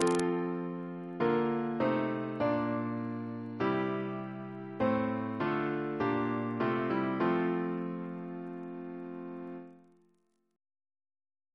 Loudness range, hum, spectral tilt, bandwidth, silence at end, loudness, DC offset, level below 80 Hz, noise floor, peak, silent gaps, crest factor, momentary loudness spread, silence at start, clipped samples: 10 LU; none; -6.5 dB/octave; 11 kHz; 1.75 s; -34 LUFS; under 0.1%; -70 dBFS; -74 dBFS; -10 dBFS; none; 24 dB; 12 LU; 0 s; under 0.1%